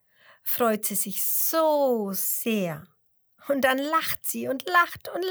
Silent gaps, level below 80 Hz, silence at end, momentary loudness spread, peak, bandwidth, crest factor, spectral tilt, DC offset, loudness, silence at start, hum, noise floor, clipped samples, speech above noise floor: none; -70 dBFS; 0 s; 9 LU; -8 dBFS; over 20 kHz; 18 dB; -3 dB/octave; under 0.1%; -24 LUFS; 0.45 s; none; -64 dBFS; under 0.1%; 39 dB